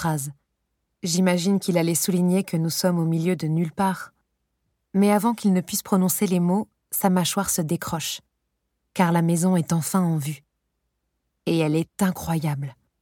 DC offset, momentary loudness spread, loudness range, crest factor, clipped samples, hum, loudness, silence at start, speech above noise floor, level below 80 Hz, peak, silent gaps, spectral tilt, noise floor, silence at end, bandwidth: under 0.1%; 10 LU; 3 LU; 18 dB; under 0.1%; none; -23 LUFS; 0 s; 54 dB; -58 dBFS; -6 dBFS; none; -5.5 dB/octave; -76 dBFS; 0.3 s; 18.5 kHz